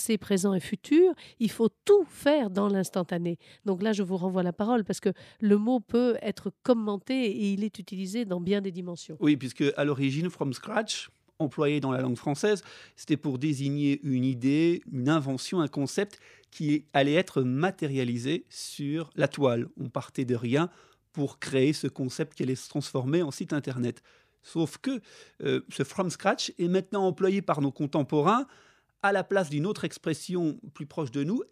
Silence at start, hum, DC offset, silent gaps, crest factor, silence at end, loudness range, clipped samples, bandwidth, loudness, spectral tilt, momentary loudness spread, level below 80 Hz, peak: 0 s; none; under 0.1%; none; 20 dB; 0.05 s; 3 LU; under 0.1%; 15 kHz; -28 LUFS; -6 dB/octave; 9 LU; -72 dBFS; -8 dBFS